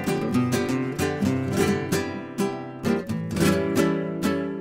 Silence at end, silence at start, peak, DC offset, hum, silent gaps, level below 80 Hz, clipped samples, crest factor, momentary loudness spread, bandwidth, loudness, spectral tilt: 0 s; 0 s; -8 dBFS; under 0.1%; none; none; -52 dBFS; under 0.1%; 16 dB; 6 LU; 16.5 kHz; -25 LUFS; -6 dB/octave